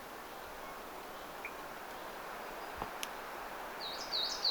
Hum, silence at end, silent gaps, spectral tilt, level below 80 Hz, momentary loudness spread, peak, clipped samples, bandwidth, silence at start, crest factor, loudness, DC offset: none; 0 s; none; -1.5 dB/octave; -64 dBFS; 11 LU; -18 dBFS; under 0.1%; over 20 kHz; 0 s; 24 dB; -42 LUFS; under 0.1%